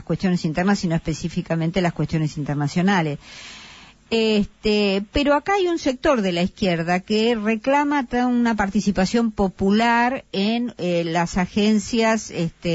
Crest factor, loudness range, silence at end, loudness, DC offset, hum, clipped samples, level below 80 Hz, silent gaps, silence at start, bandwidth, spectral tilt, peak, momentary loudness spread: 12 dB; 3 LU; 0 s; -21 LUFS; under 0.1%; none; under 0.1%; -44 dBFS; none; 0 s; 8 kHz; -5.5 dB/octave; -8 dBFS; 6 LU